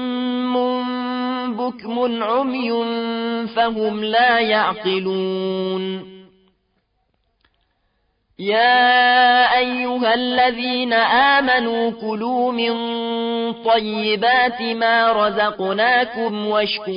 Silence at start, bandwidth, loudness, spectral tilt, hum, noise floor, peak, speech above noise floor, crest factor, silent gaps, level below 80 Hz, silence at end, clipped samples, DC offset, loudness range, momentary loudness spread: 0 s; 5.4 kHz; -18 LUFS; -9 dB/octave; none; -67 dBFS; -4 dBFS; 49 dB; 14 dB; none; -60 dBFS; 0 s; under 0.1%; under 0.1%; 8 LU; 10 LU